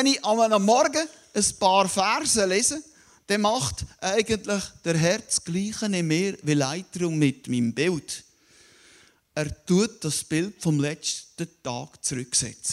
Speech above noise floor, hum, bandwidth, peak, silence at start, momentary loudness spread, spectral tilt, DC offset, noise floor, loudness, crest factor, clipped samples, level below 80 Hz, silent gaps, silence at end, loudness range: 32 dB; none; 16 kHz; -6 dBFS; 0 s; 11 LU; -4 dB/octave; under 0.1%; -57 dBFS; -24 LUFS; 18 dB; under 0.1%; -54 dBFS; none; 0 s; 5 LU